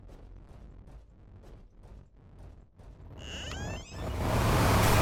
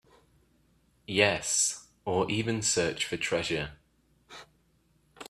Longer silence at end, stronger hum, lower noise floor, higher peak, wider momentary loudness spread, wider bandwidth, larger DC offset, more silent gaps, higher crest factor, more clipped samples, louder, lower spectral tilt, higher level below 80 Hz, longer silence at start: about the same, 0 s vs 0 s; neither; second, -52 dBFS vs -68 dBFS; second, -14 dBFS vs -6 dBFS; first, 28 LU vs 22 LU; first, 17.5 kHz vs 15 kHz; neither; neither; second, 18 dB vs 26 dB; neither; about the same, -30 LUFS vs -28 LUFS; first, -5 dB/octave vs -2.5 dB/octave; first, -40 dBFS vs -60 dBFS; second, 0.05 s vs 1.1 s